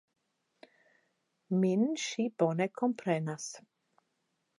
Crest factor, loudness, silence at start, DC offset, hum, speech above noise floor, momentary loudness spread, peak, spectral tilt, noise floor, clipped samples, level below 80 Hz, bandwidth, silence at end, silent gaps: 20 dB; -32 LUFS; 1.5 s; under 0.1%; none; 49 dB; 11 LU; -16 dBFS; -5.5 dB/octave; -80 dBFS; under 0.1%; -88 dBFS; 11.5 kHz; 1 s; none